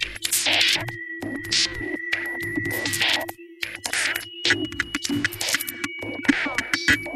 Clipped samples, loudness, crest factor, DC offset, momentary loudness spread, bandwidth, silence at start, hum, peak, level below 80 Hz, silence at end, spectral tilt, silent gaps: under 0.1%; -23 LUFS; 22 dB; under 0.1%; 11 LU; 16 kHz; 0 s; none; -4 dBFS; -50 dBFS; 0 s; -1.5 dB/octave; none